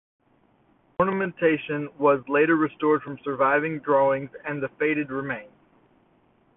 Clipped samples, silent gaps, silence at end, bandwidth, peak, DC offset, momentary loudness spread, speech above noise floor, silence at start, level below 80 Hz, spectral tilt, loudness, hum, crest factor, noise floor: under 0.1%; none; 1.1 s; 3.9 kHz; -8 dBFS; under 0.1%; 10 LU; 39 dB; 1 s; -64 dBFS; -11 dB/octave; -24 LUFS; none; 18 dB; -63 dBFS